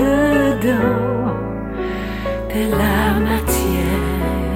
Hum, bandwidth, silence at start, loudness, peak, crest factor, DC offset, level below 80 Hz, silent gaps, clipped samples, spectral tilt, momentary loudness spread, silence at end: none; 16.5 kHz; 0 s; -18 LUFS; -4 dBFS; 14 dB; under 0.1%; -26 dBFS; none; under 0.1%; -6 dB/octave; 8 LU; 0 s